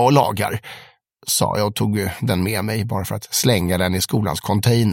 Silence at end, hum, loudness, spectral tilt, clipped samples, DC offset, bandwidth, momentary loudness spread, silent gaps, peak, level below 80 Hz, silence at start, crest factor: 0 s; none; -20 LUFS; -5 dB/octave; under 0.1%; under 0.1%; 17 kHz; 8 LU; none; -2 dBFS; -46 dBFS; 0 s; 18 dB